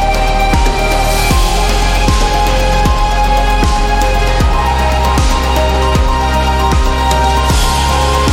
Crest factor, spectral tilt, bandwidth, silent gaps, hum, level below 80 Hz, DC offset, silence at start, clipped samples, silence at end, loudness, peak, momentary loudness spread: 10 dB; -4.5 dB/octave; 16.5 kHz; none; none; -14 dBFS; under 0.1%; 0 s; under 0.1%; 0 s; -12 LUFS; 0 dBFS; 1 LU